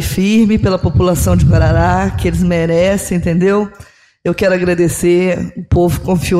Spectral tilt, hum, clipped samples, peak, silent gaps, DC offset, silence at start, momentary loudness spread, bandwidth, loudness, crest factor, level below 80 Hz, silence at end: -6.5 dB/octave; none; under 0.1%; -2 dBFS; none; under 0.1%; 0 s; 5 LU; 15.5 kHz; -13 LUFS; 10 dB; -24 dBFS; 0 s